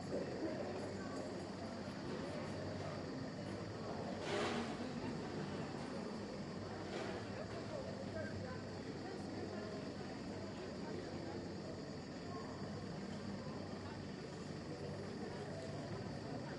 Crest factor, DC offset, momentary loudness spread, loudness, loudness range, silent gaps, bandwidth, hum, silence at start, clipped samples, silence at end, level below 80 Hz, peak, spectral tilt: 16 dB; under 0.1%; 4 LU; -46 LUFS; 3 LU; none; 11.5 kHz; none; 0 s; under 0.1%; 0 s; -68 dBFS; -28 dBFS; -6 dB/octave